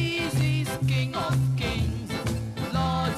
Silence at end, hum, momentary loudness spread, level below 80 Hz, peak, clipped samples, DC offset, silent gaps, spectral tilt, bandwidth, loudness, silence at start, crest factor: 0 s; none; 5 LU; -40 dBFS; -14 dBFS; under 0.1%; under 0.1%; none; -6 dB/octave; 15 kHz; -27 LUFS; 0 s; 12 dB